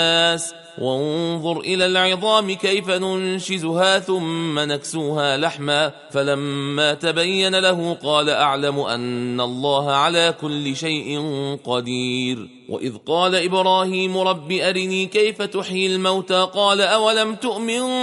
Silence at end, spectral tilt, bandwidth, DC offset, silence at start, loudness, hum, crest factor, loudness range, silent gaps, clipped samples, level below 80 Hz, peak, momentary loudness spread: 0 s; -4 dB/octave; 11.5 kHz; under 0.1%; 0 s; -19 LUFS; none; 18 dB; 2 LU; none; under 0.1%; -64 dBFS; -2 dBFS; 8 LU